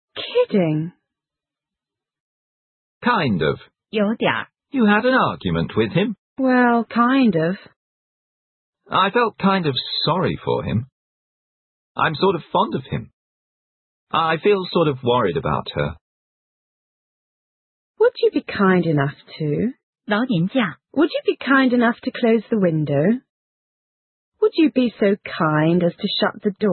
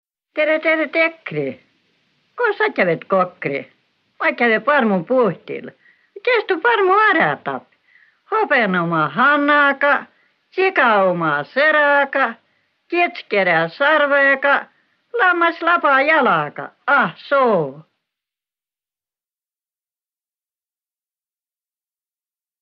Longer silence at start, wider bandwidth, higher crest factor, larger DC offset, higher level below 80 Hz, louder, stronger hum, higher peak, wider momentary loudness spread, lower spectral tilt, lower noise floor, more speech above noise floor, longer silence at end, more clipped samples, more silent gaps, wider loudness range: second, 0.15 s vs 0.35 s; second, 4.5 kHz vs 6 kHz; about the same, 18 dB vs 16 dB; neither; first, -52 dBFS vs -72 dBFS; second, -20 LUFS vs -16 LUFS; neither; about the same, -2 dBFS vs -2 dBFS; second, 9 LU vs 12 LU; first, -11.5 dB/octave vs -7.5 dB/octave; about the same, -88 dBFS vs under -90 dBFS; second, 69 dB vs over 73 dB; second, 0 s vs 4.8 s; neither; first, 2.20-3.01 s, 6.18-6.36 s, 7.76-8.73 s, 10.92-11.95 s, 13.13-14.07 s, 16.01-17.94 s, 19.83-19.93 s, 23.29-24.32 s vs none; about the same, 5 LU vs 5 LU